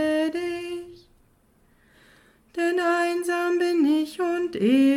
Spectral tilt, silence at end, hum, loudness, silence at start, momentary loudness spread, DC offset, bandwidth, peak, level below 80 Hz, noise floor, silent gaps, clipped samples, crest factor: -5 dB/octave; 0 s; none; -24 LUFS; 0 s; 13 LU; under 0.1%; 15.5 kHz; -10 dBFS; -64 dBFS; -61 dBFS; none; under 0.1%; 14 dB